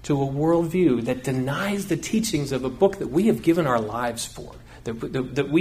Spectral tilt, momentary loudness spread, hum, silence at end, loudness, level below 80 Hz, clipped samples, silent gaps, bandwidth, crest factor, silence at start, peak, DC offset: -6 dB/octave; 12 LU; none; 0 s; -23 LUFS; -48 dBFS; under 0.1%; none; 15.5 kHz; 18 dB; 0 s; -6 dBFS; under 0.1%